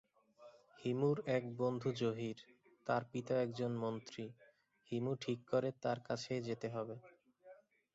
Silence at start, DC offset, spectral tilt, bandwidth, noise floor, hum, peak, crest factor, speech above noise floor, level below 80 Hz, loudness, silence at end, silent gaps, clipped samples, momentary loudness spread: 0.4 s; under 0.1%; -6 dB/octave; 8 kHz; -64 dBFS; none; -22 dBFS; 18 dB; 24 dB; -78 dBFS; -40 LUFS; 0.4 s; none; under 0.1%; 11 LU